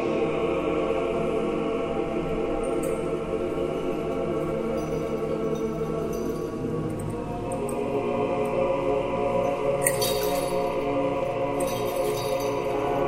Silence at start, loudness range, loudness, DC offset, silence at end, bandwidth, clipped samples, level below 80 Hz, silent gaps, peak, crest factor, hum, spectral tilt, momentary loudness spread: 0 s; 3 LU; -27 LUFS; under 0.1%; 0 s; 16 kHz; under 0.1%; -44 dBFS; none; -4 dBFS; 24 dB; none; -5 dB/octave; 4 LU